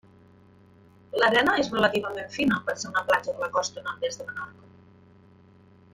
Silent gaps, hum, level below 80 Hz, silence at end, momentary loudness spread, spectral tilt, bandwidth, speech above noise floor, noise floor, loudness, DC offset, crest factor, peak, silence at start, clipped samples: none; none; -62 dBFS; 1.45 s; 13 LU; -3.5 dB/octave; 16.5 kHz; 29 dB; -55 dBFS; -26 LUFS; under 0.1%; 20 dB; -8 dBFS; 1.15 s; under 0.1%